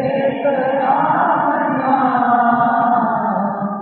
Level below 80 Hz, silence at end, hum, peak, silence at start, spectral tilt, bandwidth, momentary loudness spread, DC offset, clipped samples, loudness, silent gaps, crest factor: -64 dBFS; 0 s; none; -4 dBFS; 0 s; -10.5 dB/octave; 4.3 kHz; 4 LU; under 0.1%; under 0.1%; -16 LUFS; none; 12 dB